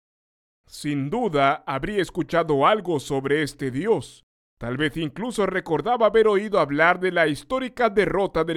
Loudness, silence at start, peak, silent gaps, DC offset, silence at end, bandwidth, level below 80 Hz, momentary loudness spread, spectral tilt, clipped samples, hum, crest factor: -22 LUFS; 0.75 s; -4 dBFS; 4.23-4.57 s; under 0.1%; 0 s; 14 kHz; -48 dBFS; 9 LU; -5.5 dB/octave; under 0.1%; none; 18 dB